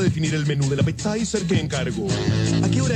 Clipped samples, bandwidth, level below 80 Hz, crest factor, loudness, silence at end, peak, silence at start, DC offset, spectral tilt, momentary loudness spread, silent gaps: under 0.1%; 10.5 kHz; -42 dBFS; 14 dB; -22 LUFS; 0 s; -6 dBFS; 0 s; under 0.1%; -5.5 dB/octave; 4 LU; none